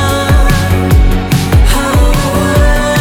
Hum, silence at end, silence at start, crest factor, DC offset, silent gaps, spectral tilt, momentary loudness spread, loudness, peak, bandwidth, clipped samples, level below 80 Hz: none; 0 s; 0 s; 8 dB; under 0.1%; none; -5.5 dB/octave; 2 LU; -10 LUFS; 0 dBFS; 18 kHz; under 0.1%; -12 dBFS